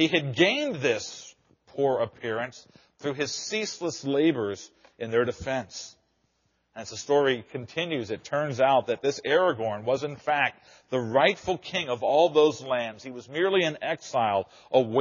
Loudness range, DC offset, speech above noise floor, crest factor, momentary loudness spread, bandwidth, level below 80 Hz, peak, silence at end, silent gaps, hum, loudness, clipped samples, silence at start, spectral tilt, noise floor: 5 LU; under 0.1%; 46 dB; 20 dB; 13 LU; 7.4 kHz; -64 dBFS; -6 dBFS; 0 s; none; none; -26 LUFS; under 0.1%; 0 s; -3 dB/octave; -72 dBFS